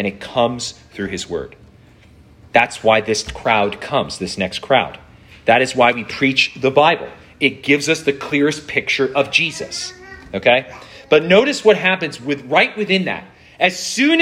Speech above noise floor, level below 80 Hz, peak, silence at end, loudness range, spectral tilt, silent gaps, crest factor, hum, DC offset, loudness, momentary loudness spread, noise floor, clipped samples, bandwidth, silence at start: 29 dB; -50 dBFS; 0 dBFS; 0 s; 3 LU; -4 dB/octave; none; 18 dB; none; under 0.1%; -17 LUFS; 13 LU; -46 dBFS; under 0.1%; 13.5 kHz; 0 s